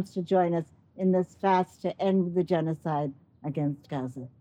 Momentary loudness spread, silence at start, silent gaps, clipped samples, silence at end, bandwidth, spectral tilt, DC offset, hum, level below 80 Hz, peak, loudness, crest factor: 10 LU; 0 s; none; under 0.1%; 0.15 s; 9.2 kHz; -8.5 dB/octave; under 0.1%; none; -70 dBFS; -12 dBFS; -28 LUFS; 16 dB